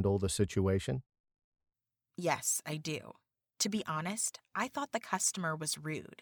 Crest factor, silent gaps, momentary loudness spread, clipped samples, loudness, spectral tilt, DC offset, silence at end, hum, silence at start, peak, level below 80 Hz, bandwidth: 22 dB; 1.20-1.24 s, 1.44-1.52 s; 8 LU; under 0.1%; -35 LUFS; -4 dB/octave; under 0.1%; 0.05 s; none; 0 s; -14 dBFS; -60 dBFS; over 20 kHz